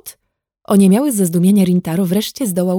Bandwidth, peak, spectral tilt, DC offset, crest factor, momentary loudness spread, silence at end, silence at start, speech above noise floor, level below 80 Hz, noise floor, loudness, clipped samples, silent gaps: 17.5 kHz; -2 dBFS; -6.5 dB/octave; under 0.1%; 14 dB; 6 LU; 0 s; 0.05 s; 58 dB; -56 dBFS; -72 dBFS; -14 LUFS; under 0.1%; none